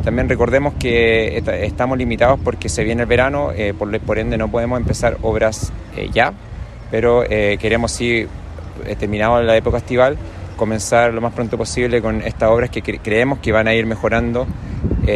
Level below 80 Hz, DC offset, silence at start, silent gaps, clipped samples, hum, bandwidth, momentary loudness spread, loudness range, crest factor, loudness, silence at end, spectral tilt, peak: -30 dBFS; under 0.1%; 0 s; none; under 0.1%; none; 13 kHz; 10 LU; 2 LU; 16 dB; -17 LUFS; 0 s; -5.5 dB/octave; -2 dBFS